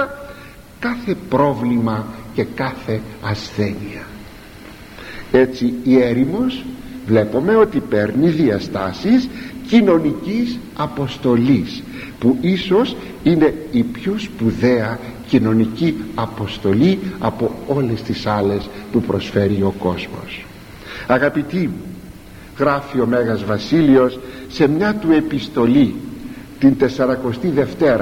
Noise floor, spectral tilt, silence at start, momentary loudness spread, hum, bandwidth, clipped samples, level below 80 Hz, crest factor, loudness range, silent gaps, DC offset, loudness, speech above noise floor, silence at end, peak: -38 dBFS; -7.5 dB/octave; 0 s; 17 LU; none; 16.5 kHz; under 0.1%; -42 dBFS; 18 dB; 5 LU; none; under 0.1%; -17 LUFS; 22 dB; 0 s; 0 dBFS